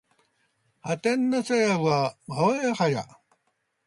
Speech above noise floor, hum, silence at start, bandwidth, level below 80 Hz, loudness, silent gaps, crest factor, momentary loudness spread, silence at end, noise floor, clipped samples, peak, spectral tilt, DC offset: 50 dB; none; 0.85 s; 11.5 kHz; -70 dBFS; -25 LUFS; none; 18 dB; 10 LU; 0.8 s; -75 dBFS; under 0.1%; -10 dBFS; -5.5 dB/octave; under 0.1%